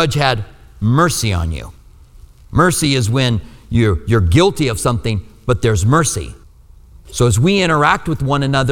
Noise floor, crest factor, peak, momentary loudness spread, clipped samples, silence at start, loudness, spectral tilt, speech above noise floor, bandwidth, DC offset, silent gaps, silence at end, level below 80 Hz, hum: -42 dBFS; 16 dB; 0 dBFS; 10 LU; under 0.1%; 0 s; -15 LUFS; -5 dB/octave; 28 dB; 17.5 kHz; under 0.1%; none; 0 s; -30 dBFS; none